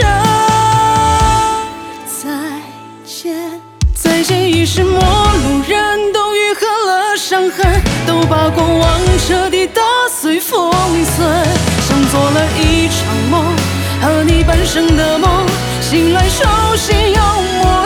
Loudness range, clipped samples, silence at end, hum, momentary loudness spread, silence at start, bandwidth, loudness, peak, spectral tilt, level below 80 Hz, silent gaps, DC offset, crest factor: 3 LU; under 0.1%; 0 s; none; 10 LU; 0 s; 19.5 kHz; -12 LUFS; 0 dBFS; -4.5 dB/octave; -20 dBFS; none; under 0.1%; 12 dB